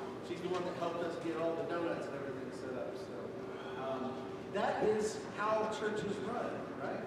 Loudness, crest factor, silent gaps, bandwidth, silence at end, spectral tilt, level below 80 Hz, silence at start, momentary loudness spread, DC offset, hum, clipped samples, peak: -38 LUFS; 18 dB; none; 13.5 kHz; 0 s; -5.5 dB/octave; -70 dBFS; 0 s; 9 LU; under 0.1%; none; under 0.1%; -20 dBFS